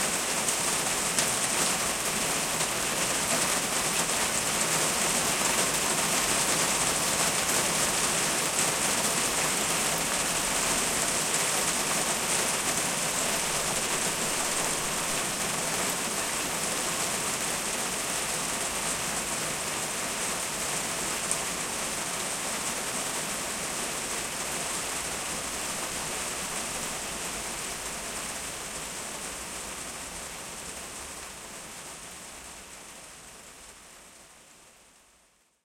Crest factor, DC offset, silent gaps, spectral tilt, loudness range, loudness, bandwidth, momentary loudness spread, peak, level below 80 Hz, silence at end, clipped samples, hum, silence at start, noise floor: 22 dB; under 0.1%; none; -1 dB/octave; 13 LU; -27 LUFS; 16.5 kHz; 13 LU; -8 dBFS; -54 dBFS; 0.95 s; under 0.1%; none; 0 s; -65 dBFS